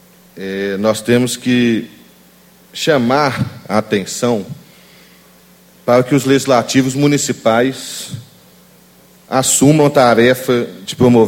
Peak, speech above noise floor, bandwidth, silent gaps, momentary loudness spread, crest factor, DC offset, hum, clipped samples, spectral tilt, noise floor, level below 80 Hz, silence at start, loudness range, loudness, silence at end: 0 dBFS; 33 dB; 17 kHz; none; 15 LU; 14 dB; under 0.1%; none; under 0.1%; -4.5 dB/octave; -46 dBFS; -52 dBFS; 0.35 s; 4 LU; -14 LUFS; 0 s